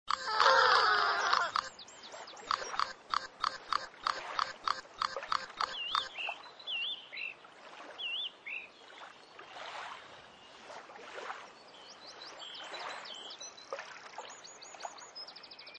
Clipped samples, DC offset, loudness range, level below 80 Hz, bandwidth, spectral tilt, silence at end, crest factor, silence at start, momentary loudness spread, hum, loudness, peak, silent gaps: under 0.1%; under 0.1%; 15 LU; -74 dBFS; 9.8 kHz; 0 dB/octave; 0 s; 26 dB; 0.05 s; 22 LU; none; -34 LUFS; -12 dBFS; none